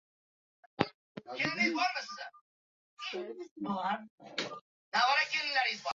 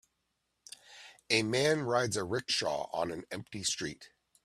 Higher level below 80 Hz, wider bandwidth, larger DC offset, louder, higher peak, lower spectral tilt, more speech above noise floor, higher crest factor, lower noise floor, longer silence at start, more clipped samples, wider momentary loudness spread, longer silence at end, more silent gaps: second, -76 dBFS vs -70 dBFS; second, 7.6 kHz vs 14 kHz; neither; about the same, -33 LUFS vs -32 LUFS; first, -6 dBFS vs -14 dBFS; second, -1 dB/octave vs -3.5 dB/octave; first, over 55 dB vs 49 dB; first, 30 dB vs 22 dB; first, under -90 dBFS vs -81 dBFS; about the same, 0.8 s vs 0.9 s; neither; second, 17 LU vs 22 LU; second, 0 s vs 0.4 s; first, 0.94-1.15 s, 2.41-2.97 s, 3.51-3.56 s, 4.10-4.18 s, 4.61-4.92 s vs none